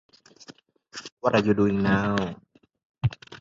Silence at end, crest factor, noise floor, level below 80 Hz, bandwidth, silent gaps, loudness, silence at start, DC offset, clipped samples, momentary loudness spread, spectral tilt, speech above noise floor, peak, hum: 0.05 s; 20 dB; -52 dBFS; -50 dBFS; 7.6 kHz; 1.12-1.17 s, 2.85-2.94 s; -25 LUFS; 0.5 s; under 0.1%; under 0.1%; 19 LU; -7 dB/octave; 29 dB; -8 dBFS; none